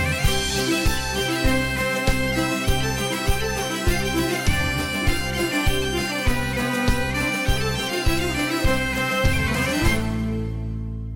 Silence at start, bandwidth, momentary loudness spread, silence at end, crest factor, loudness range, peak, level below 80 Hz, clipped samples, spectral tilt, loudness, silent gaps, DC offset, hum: 0 s; 17 kHz; 3 LU; 0 s; 14 dB; 1 LU; -8 dBFS; -28 dBFS; under 0.1%; -4 dB/octave; -22 LUFS; none; under 0.1%; none